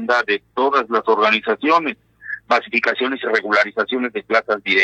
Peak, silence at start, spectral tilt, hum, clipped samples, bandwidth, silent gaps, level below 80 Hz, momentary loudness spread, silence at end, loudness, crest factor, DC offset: -2 dBFS; 0 s; -4 dB/octave; none; under 0.1%; 8.4 kHz; none; -66 dBFS; 6 LU; 0 s; -18 LUFS; 16 dB; under 0.1%